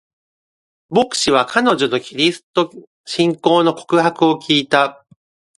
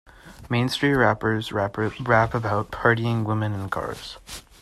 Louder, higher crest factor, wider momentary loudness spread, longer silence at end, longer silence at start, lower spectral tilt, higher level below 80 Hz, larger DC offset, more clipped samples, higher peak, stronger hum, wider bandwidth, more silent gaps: first, -16 LUFS vs -23 LUFS; about the same, 18 dB vs 20 dB; second, 6 LU vs 13 LU; first, 0.65 s vs 0.2 s; first, 0.9 s vs 0.25 s; second, -4 dB/octave vs -6 dB/octave; second, -58 dBFS vs -48 dBFS; neither; neither; first, 0 dBFS vs -4 dBFS; neither; second, 11.5 kHz vs 13.5 kHz; first, 2.43-2.54 s, 2.87-3.04 s vs none